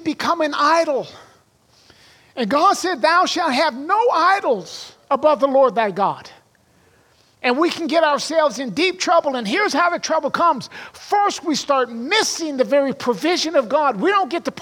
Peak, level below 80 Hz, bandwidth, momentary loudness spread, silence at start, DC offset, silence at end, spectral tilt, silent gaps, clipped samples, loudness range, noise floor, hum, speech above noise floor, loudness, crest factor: -2 dBFS; -68 dBFS; 17 kHz; 8 LU; 0 s; under 0.1%; 0 s; -3 dB/octave; none; under 0.1%; 3 LU; -56 dBFS; none; 38 dB; -18 LUFS; 16 dB